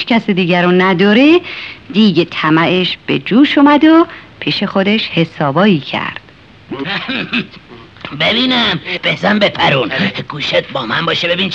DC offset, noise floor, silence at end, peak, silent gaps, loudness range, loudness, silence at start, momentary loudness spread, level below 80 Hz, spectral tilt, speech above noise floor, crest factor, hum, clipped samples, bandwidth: 0.2%; -40 dBFS; 0 s; 0 dBFS; none; 5 LU; -12 LUFS; 0 s; 11 LU; -50 dBFS; -6.5 dB/octave; 28 dB; 12 dB; none; under 0.1%; 7.6 kHz